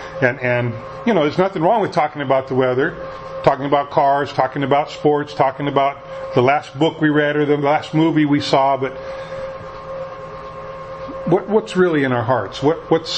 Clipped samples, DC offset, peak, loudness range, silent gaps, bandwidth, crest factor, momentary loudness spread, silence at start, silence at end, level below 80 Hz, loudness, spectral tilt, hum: under 0.1%; under 0.1%; 0 dBFS; 4 LU; none; 8.6 kHz; 18 dB; 14 LU; 0 s; 0 s; -50 dBFS; -18 LUFS; -6.5 dB/octave; none